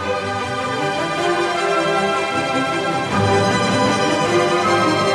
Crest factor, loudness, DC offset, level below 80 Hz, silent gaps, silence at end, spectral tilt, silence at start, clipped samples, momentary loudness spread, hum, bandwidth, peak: 14 dB; -18 LUFS; under 0.1%; -50 dBFS; none; 0 s; -4.5 dB/octave; 0 s; under 0.1%; 5 LU; none; 13.5 kHz; -4 dBFS